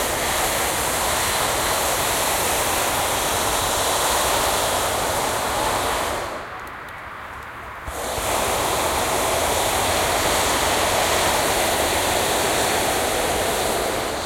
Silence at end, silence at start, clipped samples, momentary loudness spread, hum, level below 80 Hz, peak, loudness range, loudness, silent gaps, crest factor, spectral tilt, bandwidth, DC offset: 0 s; 0 s; under 0.1%; 11 LU; none; -40 dBFS; -8 dBFS; 6 LU; -20 LUFS; none; 14 dB; -2 dB/octave; 16.5 kHz; under 0.1%